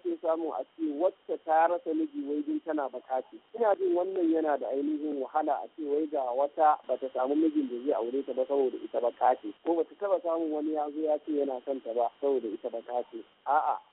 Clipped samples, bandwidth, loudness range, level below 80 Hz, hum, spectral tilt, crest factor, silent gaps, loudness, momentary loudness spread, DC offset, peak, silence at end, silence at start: under 0.1%; 4 kHz; 2 LU; -82 dBFS; none; -3 dB/octave; 16 dB; none; -30 LUFS; 9 LU; under 0.1%; -12 dBFS; 0.1 s; 0.05 s